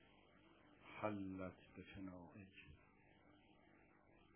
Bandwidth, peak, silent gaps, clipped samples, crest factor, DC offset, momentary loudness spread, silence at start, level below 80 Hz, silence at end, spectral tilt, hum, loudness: 4 kHz; -30 dBFS; none; under 0.1%; 26 dB; under 0.1%; 18 LU; 0 s; -74 dBFS; 0 s; -6 dB/octave; 50 Hz at -80 dBFS; -53 LUFS